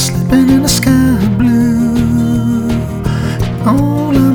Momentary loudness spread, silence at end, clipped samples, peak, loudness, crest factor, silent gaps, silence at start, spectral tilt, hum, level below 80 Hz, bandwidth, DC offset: 7 LU; 0 s; under 0.1%; 0 dBFS; -12 LUFS; 10 dB; none; 0 s; -6 dB/octave; none; -26 dBFS; 19.5 kHz; under 0.1%